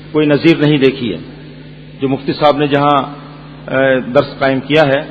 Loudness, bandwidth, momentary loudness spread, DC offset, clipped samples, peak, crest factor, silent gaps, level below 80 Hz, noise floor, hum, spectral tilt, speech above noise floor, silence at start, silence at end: -13 LUFS; 8 kHz; 21 LU; under 0.1%; 0.2%; 0 dBFS; 14 dB; none; -44 dBFS; -33 dBFS; none; -8 dB/octave; 21 dB; 0 s; 0 s